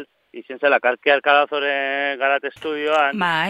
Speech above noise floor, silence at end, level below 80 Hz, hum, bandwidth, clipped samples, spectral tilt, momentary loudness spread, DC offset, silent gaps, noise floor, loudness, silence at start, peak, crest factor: 20 dB; 0 s; -72 dBFS; none; 12 kHz; under 0.1%; -4.5 dB/octave; 9 LU; under 0.1%; none; -39 dBFS; -19 LUFS; 0 s; -2 dBFS; 18 dB